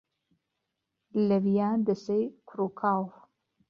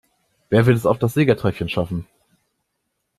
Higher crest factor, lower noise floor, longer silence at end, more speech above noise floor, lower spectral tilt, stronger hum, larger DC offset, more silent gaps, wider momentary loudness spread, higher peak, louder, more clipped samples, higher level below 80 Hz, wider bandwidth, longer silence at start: about the same, 16 dB vs 18 dB; first, -83 dBFS vs -75 dBFS; second, 0.6 s vs 1.15 s; about the same, 56 dB vs 57 dB; first, -9 dB/octave vs -7.5 dB/octave; neither; neither; neither; about the same, 9 LU vs 9 LU; second, -14 dBFS vs -2 dBFS; second, -29 LUFS vs -19 LUFS; neither; second, -72 dBFS vs -48 dBFS; second, 6.8 kHz vs 14 kHz; first, 1.15 s vs 0.5 s